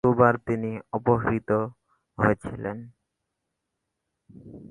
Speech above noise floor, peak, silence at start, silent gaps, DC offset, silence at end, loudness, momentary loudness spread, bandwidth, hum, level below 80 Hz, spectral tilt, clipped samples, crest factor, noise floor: 57 dB; -4 dBFS; 0.05 s; none; under 0.1%; 0.05 s; -25 LUFS; 21 LU; 11 kHz; none; -52 dBFS; -10 dB/octave; under 0.1%; 22 dB; -82 dBFS